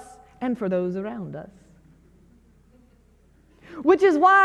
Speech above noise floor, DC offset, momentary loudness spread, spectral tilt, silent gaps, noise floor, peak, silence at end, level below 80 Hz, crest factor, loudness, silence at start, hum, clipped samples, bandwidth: 37 dB; under 0.1%; 21 LU; -6.5 dB/octave; none; -57 dBFS; -6 dBFS; 0 s; -58 dBFS; 18 dB; -22 LUFS; 0 s; none; under 0.1%; 10 kHz